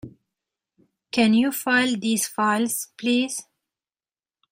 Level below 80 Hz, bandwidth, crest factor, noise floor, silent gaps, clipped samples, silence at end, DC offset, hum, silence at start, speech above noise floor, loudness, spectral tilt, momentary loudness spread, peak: -66 dBFS; 16.5 kHz; 20 dB; under -90 dBFS; none; under 0.1%; 1.1 s; under 0.1%; none; 0.05 s; over 68 dB; -22 LUFS; -3 dB/octave; 8 LU; -4 dBFS